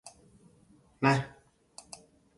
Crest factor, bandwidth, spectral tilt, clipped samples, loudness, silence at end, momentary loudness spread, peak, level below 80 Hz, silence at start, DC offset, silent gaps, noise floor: 26 dB; 11.5 kHz; -6 dB/octave; under 0.1%; -29 LUFS; 1.1 s; 25 LU; -10 dBFS; -66 dBFS; 0.05 s; under 0.1%; none; -62 dBFS